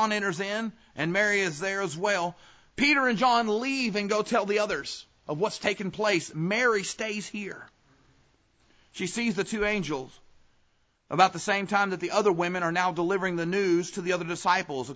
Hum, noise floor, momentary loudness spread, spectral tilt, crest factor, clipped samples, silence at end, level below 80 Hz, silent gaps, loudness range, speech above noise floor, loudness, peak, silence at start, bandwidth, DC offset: none; -68 dBFS; 12 LU; -4 dB/octave; 22 dB; under 0.1%; 0 s; -62 dBFS; none; 7 LU; 41 dB; -27 LUFS; -6 dBFS; 0 s; 8 kHz; under 0.1%